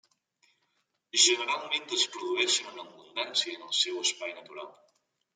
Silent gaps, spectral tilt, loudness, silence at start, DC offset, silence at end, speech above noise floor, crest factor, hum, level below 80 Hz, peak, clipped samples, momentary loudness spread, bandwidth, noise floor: none; 1.5 dB/octave; -27 LUFS; 1.15 s; under 0.1%; 0.65 s; 46 dB; 24 dB; none; under -90 dBFS; -8 dBFS; under 0.1%; 21 LU; 10 kHz; -77 dBFS